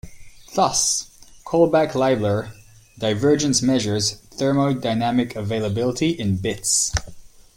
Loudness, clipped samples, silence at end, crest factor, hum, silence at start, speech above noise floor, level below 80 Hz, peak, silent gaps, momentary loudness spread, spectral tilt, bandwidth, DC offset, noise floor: -20 LUFS; under 0.1%; 0.15 s; 18 dB; none; 0.05 s; 20 dB; -44 dBFS; -2 dBFS; none; 7 LU; -4 dB/octave; 16.5 kHz; under 0.1%; -40 dBFS